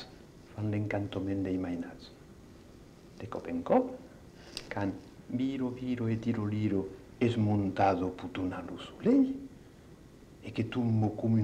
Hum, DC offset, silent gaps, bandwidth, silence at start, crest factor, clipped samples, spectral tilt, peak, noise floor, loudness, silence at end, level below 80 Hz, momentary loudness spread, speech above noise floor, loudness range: none; under 0.1%; none; 9.6 kHz; 0 s; 18 dB; under 0.1%; -8 dB/octave; -16 dBFS; -54 dBFS; -32 LUFS; 0 s; -60 dBFS; 19 LU; 23 dB; 6 LU